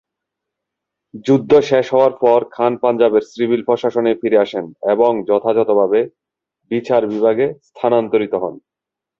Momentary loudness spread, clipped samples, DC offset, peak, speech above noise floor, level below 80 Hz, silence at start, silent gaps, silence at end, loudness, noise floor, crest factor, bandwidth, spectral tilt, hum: 9 LU; under 0.1%; under 0.1%; -2 dBFS; 70 dB; -58 dBFS; 1.15 s; none; 0.6 s; -16 LUFS; -85 dBFS; 14 dB; 7.2 kHz; -7 dB/octave; none